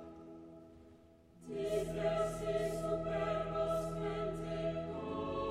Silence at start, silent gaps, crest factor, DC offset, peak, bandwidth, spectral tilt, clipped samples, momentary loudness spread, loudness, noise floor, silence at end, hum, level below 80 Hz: 0 s; none; 16 dB; under 0.1%; -22 dBFS; 15 kHz; -6.5 dB/octave; under 0.1%; 18 LU; -38 LUFS; -62 dBFS; 0 s; none; -54 dBFS